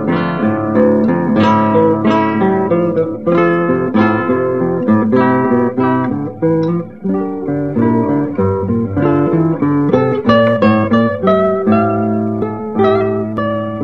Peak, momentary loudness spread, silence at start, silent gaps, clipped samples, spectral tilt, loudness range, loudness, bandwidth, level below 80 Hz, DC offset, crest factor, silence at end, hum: 0 dBFS; 6 LU; 0 s; none; under 0.1%; -9.5 dB/octave; 3 LU; -14 LUFS; 6.4 kHz; -46 dBFS; 0.7%; 12 dB; 0 s; none